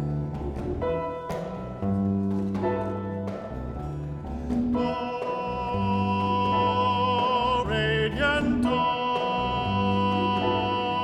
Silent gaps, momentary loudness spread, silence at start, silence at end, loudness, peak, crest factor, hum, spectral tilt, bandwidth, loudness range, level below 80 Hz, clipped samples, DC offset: none; 10 LU; 0 s; 0 s; -26 LUFS; -12 dBFS; 14 dB; none; -7 dB/octave; 10.5 kHz; 6 LU; -42 dBFS; under 0.1%; under 0.1%